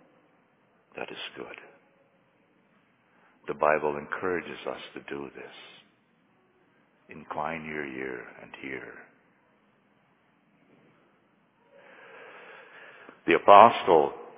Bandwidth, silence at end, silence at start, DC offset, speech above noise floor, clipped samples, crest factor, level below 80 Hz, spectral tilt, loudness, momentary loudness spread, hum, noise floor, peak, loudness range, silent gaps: 4 kHz; 0.1 s; 0.95 s; under 0.1%; 41 dB; under 0.1%; 28 dB; -68 dBFS; -2.5 dB/octave; -25 LUFS; 30 LU; none; -66 dBFS; 0 dBFS; 22 LU; none